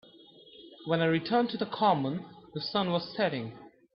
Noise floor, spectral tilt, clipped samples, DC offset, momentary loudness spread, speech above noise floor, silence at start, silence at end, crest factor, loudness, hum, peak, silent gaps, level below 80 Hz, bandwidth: -55 dBFS; -9.5 dB/octave; under 0.1%; under 0.1%; 16 LU; 26 dB; 0.55 s; 0.25 s; 18 dB; -30 LUFS; none; -12 dBFS; none; -72 dBFS; 5.8 kHz